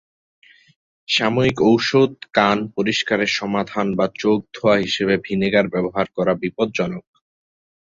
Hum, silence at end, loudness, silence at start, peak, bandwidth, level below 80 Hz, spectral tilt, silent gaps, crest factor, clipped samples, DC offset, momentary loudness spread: none; 0.85 s; -19 LUFS; 1.1 s; -2 dBFS; 7.8 kHz; -52 dBFS; -5.5 dB/octave; none; 18 dB; under 0.1%; under 0.1%; 6 LU